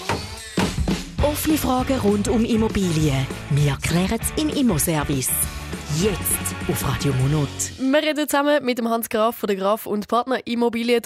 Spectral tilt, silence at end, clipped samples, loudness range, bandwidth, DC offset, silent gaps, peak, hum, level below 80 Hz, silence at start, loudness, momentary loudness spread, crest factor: -5 dB/octave; 0.05 s; under 0.1%; 1 LU; 16 kHz; under 0.1%; none; -8 dBFS; none; -36 dBFS; 0 s; -21 LUFS; 5 LU; 14 dB